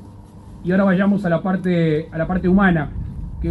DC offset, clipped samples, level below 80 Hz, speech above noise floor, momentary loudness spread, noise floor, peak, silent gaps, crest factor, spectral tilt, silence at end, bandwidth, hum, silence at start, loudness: under 0.1%; under 0.1%; -34 dBFS; 22 dB; 13 LU; -39 dBFS; -2 dBFS; none; 16 dB; -9.5 dB/octave; 0 s; 4.4 kHz; none; 0 s; -18 LUFS